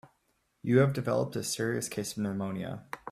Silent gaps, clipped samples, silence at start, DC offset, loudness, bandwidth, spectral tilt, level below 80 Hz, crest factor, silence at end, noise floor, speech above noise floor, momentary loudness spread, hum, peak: none; under 0.1%; 0.05 s; under 0.1%; -31 LUFS; 15.5 kHz; -5.5 dB/octave; -66 dBFS; 22 dB; 0 s; -75 dBFS; 45 dB; 13 LU; none; -10 dBFS